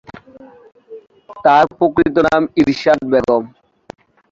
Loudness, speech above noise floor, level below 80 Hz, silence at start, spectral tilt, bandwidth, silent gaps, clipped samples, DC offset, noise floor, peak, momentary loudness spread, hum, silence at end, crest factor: -14 LUFS; 28 dB; -46 dBFS; 0.15 s; -6.5 dB/octave; 7.6 kHz; none; under 0.1%; under 0.1%; -41 dBFS; -2 dBFS; 6 LU; none; 0.85 s; 16 dB